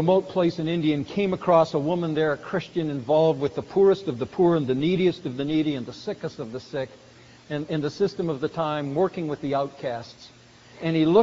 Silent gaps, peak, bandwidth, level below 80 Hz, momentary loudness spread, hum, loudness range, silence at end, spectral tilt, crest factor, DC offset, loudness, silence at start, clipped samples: none; -6 dBFS; 7.6 kHz; -60 dBFS; 12 LU; none; 6 LU; 0 s; -6 dB/octave; 18 dB; under 0.1%; -25 LUFS; 0 s; under 0.1%